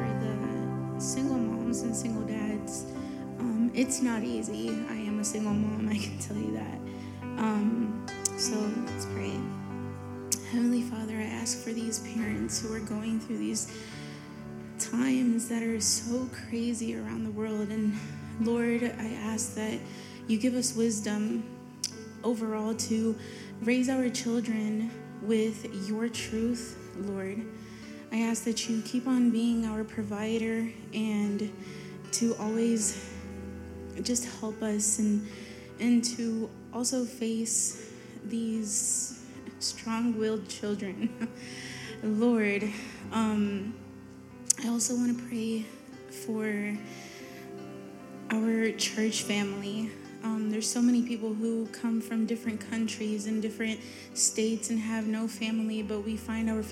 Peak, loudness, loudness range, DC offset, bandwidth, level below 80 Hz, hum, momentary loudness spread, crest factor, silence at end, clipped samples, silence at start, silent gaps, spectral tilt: -2 dBFS; -31 LUFS; 3 LU; under 0.1%; 16 kHz; -60 dBFS; none; 14 LU; 28 dB; 0 s; under 0.1%; 0 s; none; -4 dB/octave